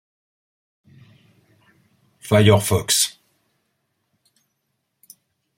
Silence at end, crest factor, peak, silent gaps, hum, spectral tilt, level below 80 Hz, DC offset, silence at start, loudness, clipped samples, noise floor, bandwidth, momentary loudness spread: 2.45 s; 22 dB; -2 dBFS; none; none; -4 dB/octave; -54 dBFS; under 0.1%; 2.25 s; -17 LUFS; under 0.1%; -75 dBFS; 16.5 kHz; 8 LU